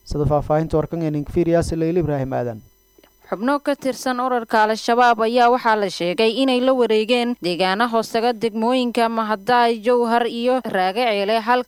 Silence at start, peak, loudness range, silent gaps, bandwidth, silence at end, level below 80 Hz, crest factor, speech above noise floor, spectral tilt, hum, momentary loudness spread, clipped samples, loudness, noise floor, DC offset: 0.05 s; -2 dBFS; 5 LU; none; 16 kHz; 0.05 s; -42 dBFS; 16 dB; 36 dB; -5.5 dB/octave; none; 7 LU; under 0.1%; -19 LUFS; -54 dBFS; under 0.1%